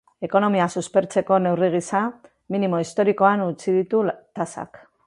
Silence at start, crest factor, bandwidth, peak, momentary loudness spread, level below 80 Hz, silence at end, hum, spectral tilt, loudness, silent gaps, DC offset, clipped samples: 0.2 s; 18 dB; 11.5 kHz; -4 dBFS; 11 LU; -66 dBFS; 0.4 s; none; -6.5 dB/octave; -22 LUFS; none; under 0.1%; under 0.1%